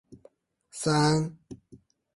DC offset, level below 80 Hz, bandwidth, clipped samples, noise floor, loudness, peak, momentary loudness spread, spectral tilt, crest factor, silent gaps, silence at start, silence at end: under 0.1%; -60 dBFS; 11.5 kHz; under 0.1%; -60 dBFS; -26 LUFS; -12 dBFS; 25 LU; -5 dB/octave; 18 dB; none; 0.1 s; 0.4 s